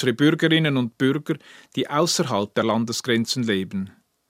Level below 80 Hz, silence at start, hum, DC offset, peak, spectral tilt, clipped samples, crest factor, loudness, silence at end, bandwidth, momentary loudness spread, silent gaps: -68 dBFS; 0 s; none; under 0.1%; -4 dBFS; -4.5 dB/octave; under 0.1%; 18 dB; -22 LUFS; 0.4 s; 16 kHz; 12 LU; none